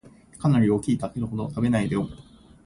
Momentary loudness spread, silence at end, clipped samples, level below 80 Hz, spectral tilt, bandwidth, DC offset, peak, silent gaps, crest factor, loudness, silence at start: 9 LU; 0.45 s; under 0.1%; -50 dBFS; -7.5 dB/octave; 11.5 kHz; under 0.1%; -10 dBFS; none; 14 dB; -25 LUFS; 0.05 s